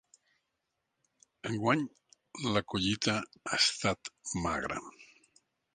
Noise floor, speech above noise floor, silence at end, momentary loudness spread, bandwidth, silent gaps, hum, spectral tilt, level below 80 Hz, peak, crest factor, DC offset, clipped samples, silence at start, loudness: -84 dBFS; 51 dB; 0.7 s; 14 LU; 10 kHz; none; none; -3.5 dB/octave; -58 dBFS; -12 dBFS; 24 dB; under 0.1%; under 0.1%; 1.45 s; -32 LUFS